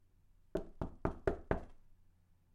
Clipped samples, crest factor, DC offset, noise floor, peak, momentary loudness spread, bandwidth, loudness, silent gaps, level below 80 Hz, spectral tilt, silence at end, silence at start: under 0.1%; 28 dB; under 0.1%; -68 dBFS; -16 dBFS; 8 LU; 11 kHz; -42 LUFS; none; -50 dBFS; -8.5 dB/octave; 0.6 s; 0.55 s